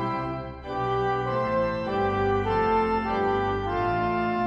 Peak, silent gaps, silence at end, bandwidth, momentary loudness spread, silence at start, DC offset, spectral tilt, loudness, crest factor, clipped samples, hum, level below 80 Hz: -12 dBFS; none; 0 s; 7.6 kHz; 7 LU; 0 s; under 0.1%; -8 dB/octave; -26 LUFS; 12 dB; under 0.1%; none; -44 dBFS